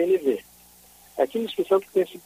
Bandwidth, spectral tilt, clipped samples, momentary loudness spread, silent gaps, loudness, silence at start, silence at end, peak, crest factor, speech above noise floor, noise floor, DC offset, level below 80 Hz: 15.5 kHz; -5.5 dB/octave; under 0.1%; 8 LU; none; -25 LUFS; 0 s; 0.05 s; -8 dBFS; 16 dB; 29 dB; -52 dBFS; under 0.1%; -66 dBFS